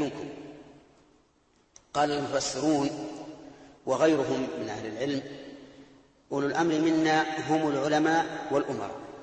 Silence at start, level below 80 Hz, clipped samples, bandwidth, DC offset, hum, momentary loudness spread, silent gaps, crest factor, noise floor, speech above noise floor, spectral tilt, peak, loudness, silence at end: 0 s; -66 dBFS; under 0.1%; 8.8 kHz; under 0.1%; none; 18 LU; none; 18 dB; -66 dBFS; 39 dB; -4.5 dB/octave; -12 dBFS; -28 LUFS; 0 s